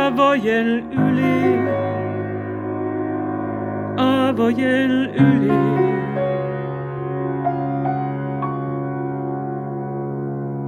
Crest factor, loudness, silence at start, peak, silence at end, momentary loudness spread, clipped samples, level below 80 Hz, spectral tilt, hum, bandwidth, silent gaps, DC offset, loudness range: 18 dB; -20 LUFS; 0 s; -2 dBFS; 0 s; 10 LU; under 0.1%; -54 dBFS; -8 dB/octave; none; 9.6 kHz; none; under 0.1%; 6 LU